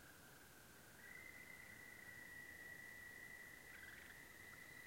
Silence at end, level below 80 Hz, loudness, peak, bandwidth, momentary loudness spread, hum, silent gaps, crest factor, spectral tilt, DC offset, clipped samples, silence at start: 0 s; -78 dBFS; -57 LUFS; -46 dBFS; 16.5 kHz; 7 LU; none; none; 14 dB; -2.5 dB/octave; under 0.1%; under 0.1%; 0 s